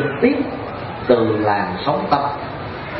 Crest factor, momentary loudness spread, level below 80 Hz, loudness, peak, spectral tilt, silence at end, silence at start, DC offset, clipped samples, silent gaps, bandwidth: 18 dB; 11 LU; -46 dBFS; -19 LUFS; 0 dBFS; -11 dB/octave; 0 s; 0 s; under 0.1%; under 0.1%; none; 5.8 kHz